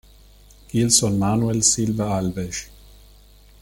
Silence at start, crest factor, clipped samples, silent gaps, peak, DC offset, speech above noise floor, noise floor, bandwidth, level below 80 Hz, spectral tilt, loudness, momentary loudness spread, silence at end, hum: 0.75 s; 20 dB; under 0.1%; none; -2 dBFS; under 0.1%; 29 dB; -49 dBFS; 17 kHz; -46 dBFS; -4 dB/octave; -20 LUFS; 12 LU; 0.95 s; 50 Hz at -40 dBFS